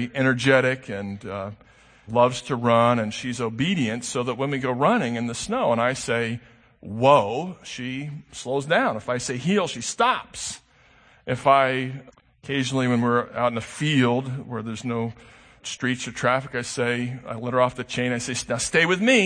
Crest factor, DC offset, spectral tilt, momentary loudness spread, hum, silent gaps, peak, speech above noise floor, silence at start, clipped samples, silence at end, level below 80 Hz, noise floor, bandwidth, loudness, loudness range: 22 dB; under 0.1%; -4.5 dB/octave; 14 LU; none; none; -2 dBFS; 32 dB; 0 s; under 0.1%; 0 s; -58 dBFS; -56 dBFS; 9.8 kHz; -23 LUFS; 3 LU